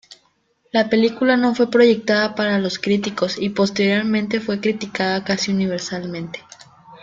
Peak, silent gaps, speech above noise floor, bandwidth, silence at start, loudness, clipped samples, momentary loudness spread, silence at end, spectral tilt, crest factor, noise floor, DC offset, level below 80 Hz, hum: -2 dBFS; none; 44 dB; 7.6 kHz; 0.1 s; -19 LUFS; under 0.1%; 11 LU; 0.05 s; -5 dB/octave; 18 dB; -63 dBFS; under 0.1%; -60 dBFS; none